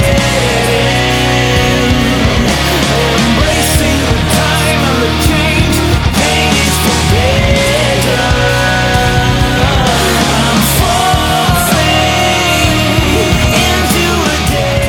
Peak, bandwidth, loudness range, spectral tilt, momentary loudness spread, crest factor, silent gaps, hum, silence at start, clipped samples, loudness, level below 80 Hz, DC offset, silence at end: 0 dBFS; 19 kHz; 1 LU; -4 dB/octave; 1 LU; 10 dB; none; none; 0 s; under 0.1%; -10 LUFS; -20 dBFS; under 0.1%; 0 s